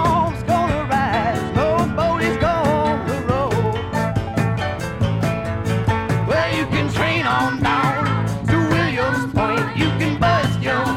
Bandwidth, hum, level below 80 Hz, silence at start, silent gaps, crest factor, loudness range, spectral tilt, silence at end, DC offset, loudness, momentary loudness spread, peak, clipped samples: 15 kHz; none; -36 dBFS; 0 s; none; 14 dB; 2 LU; -6.5 dB/octave; 0 s; under 0.1%; -19 LUFS; 4 LU; -4 dBFS; under 0.1%